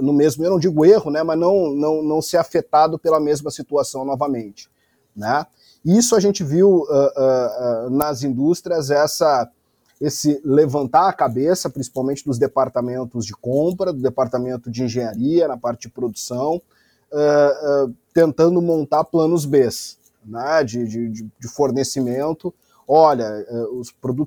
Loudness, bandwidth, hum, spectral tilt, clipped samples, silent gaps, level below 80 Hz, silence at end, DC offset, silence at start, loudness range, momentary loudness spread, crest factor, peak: -19 LUFS; over 20 kHz; none; -5.5 dB/octave; under 0.1%; none; -58 dBFS; 0 s; under 0.1%; 0 s; 4 LU; 12 LU; 18 dB; 0 dBFS